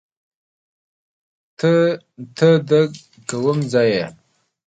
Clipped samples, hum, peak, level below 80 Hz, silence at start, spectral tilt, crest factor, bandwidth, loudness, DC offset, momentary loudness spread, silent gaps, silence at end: under 0.1%; none; -2 dBFS; -64 dBFS; 1.6 s; -6.5 dB/octave; 18 dB; 9.4 kHz; -18 LUFS; under 0.1%; 15 LU; none; 0.55 s